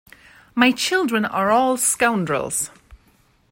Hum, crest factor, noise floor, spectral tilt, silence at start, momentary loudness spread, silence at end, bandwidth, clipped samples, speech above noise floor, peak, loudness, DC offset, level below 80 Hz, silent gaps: none; 20 dB; -58 dBFS; -3 dB/octave; 0.55 s; 8 LU; 0.55 s; 16.5 kHz; under 0.1%; 39 dB; -2 dBFS; -19 LUFS; under 0.1%; -56 dBFS; none